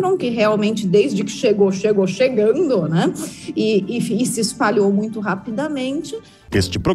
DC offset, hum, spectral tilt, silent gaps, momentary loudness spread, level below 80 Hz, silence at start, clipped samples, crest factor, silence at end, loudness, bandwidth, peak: under 0.1%; none; -5.5 dB/octave; none; 8 LU; -46 dBFS; 0 s; under 0.1%; 14 dB; 0 s; -18 LUFS; 15 kHz; -4 dBFS